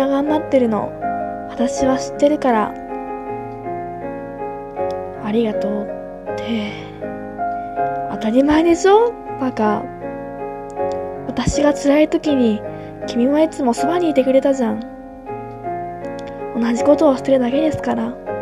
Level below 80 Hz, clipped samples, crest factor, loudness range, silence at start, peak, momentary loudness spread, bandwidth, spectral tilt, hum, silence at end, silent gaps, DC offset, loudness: -44 dBFS; under 0.1%; 16 dB; 6 LU; 0 s; -2 dBFS; 14 LU; 13.5 kHz; -5.5 dB/octave; none; 0 s; none; under 0.1%; -19 LUFS